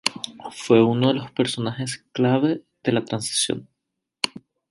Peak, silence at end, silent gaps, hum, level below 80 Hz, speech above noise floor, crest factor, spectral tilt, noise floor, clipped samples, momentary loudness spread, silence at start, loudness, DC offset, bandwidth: -2 dBFS; 0.4 s; none; none; -64 dBFS; 59 dB; 22 dB; -4.5 dB/octave; -81 dBFS; under 0.1%; 12 LU; 0.05 s; -22 LUFS; under 0.1%; 11.5 kHz